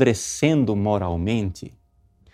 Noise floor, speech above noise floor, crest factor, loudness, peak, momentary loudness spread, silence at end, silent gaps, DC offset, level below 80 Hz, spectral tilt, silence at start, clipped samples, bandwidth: -57 dBFS; 36 dB; 20 dB; -22 LUFS; -2 dBFS; 14 LU; 0.65 s; none; under 0.1%; -44 dBFS; -5.5 dB/octave; 0 s; under 0.1%; 15.5 kHz